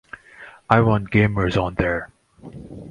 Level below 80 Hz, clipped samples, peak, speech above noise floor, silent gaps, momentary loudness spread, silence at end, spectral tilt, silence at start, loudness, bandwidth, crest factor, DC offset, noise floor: -40 dBFS; under 0.1%; 0 dBFS; 26 dB; none; 24 LU; 0 s; -8 dB/octave; 0.4 s; -20 LUFS; 9.2 kHz; 22 dB; under 0.1%; -45 dBFS